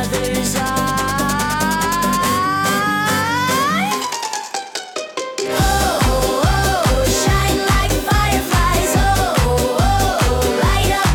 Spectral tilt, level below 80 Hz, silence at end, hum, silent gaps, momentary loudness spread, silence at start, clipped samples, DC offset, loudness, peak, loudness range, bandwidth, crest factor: -4 dB/octave; -24 dBFS; 0 s; none; none; 6 LU; 0 s; under 0.1%; under 0.1%; -17 LUFS; -4 dBFS; 3 LU; 18 kHz; 12 dB